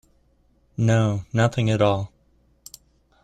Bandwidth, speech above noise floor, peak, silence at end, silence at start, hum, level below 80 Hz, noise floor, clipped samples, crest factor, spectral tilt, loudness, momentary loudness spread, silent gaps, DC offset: 12 kHz; 41 dB; -6 dBFS; 1.15 s; 0.8 s; none; -52 dBFS; -62 dBFS; under 0.1%; 18 dB; -6.5 dB/octave; -22 LUFS; 24 LU; none; under 0.1%